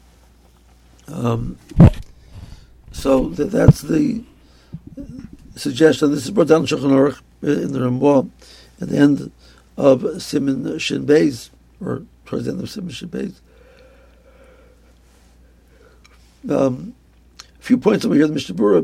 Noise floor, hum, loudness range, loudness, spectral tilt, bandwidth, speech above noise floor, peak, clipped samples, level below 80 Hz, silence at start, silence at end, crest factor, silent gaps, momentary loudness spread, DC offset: -50 dBFS; none; 13 LU; -18 LUFS; -7 dB/octave; 15.5 kHz; 34 dB; 0 dBFS; under 0.1%; -36 dBFS; 1.1 s; 0 s; 20 dB; none; 22 LU; under 0.1%